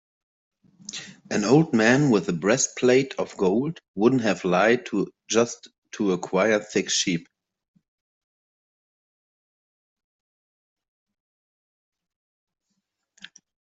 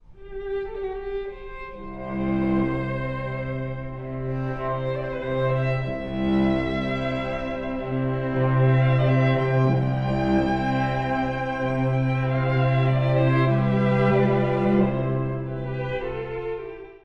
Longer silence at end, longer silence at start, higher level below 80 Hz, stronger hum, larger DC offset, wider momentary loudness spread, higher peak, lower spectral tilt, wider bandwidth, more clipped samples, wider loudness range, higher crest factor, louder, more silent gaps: first, 6.5 s vs 0.05 s; first, 0.9 s vs 0.1 s; second, -68 dBFS vs -40 dBFS; neither; neither; about the same, 14 LU vs 12 LU; first, -4 dBFS vs -8 dBFS; second, -4.5 dB/octave vs -9.5 dB/octave; first, 8.2 kHz vs 5.8 kHz; neither; about the same, 7 LU vs 7 LU; first, 22 dB vs 14 dB; about the same, -22 LUFS vs -24 LUFS; first, 3.88-3.94 s, 5.78-5.82 s vs none